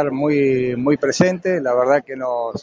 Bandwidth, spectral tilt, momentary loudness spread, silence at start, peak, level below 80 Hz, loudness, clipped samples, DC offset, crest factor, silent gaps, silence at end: 9.6 kHz; -6 dB/octave; 6 LU; 0 s; 0 dBFS; -56 dBFS; -18 LUFS; under 0.1%; under 0.1%; 18 dB; none; 0 s